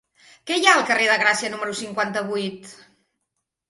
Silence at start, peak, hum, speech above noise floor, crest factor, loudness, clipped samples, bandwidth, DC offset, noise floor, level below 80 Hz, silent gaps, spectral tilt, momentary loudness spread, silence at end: 0.45 s; 0 dBFS; none; 58 dB; 22 dB; -20 LUFS; under 0.1%; 11.5 kHz; under 0.1%; -79 dBFS; -70 dBFS; none; -2 dB/octave; 14 LU; 0.95 s